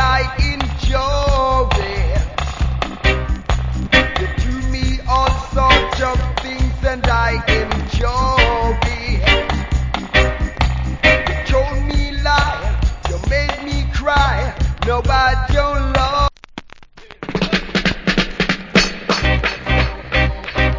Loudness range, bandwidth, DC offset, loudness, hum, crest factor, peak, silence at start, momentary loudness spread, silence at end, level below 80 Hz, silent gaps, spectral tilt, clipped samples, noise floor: 2 LU; 7.6 kHz; under 0.1%; -17 LUFS; none; 16 dB; 0 dBFS; 0 s; 7 LU; 0 s; -20 dBFS; none; -5 dB/octave; under 0.1%; -39 dBFS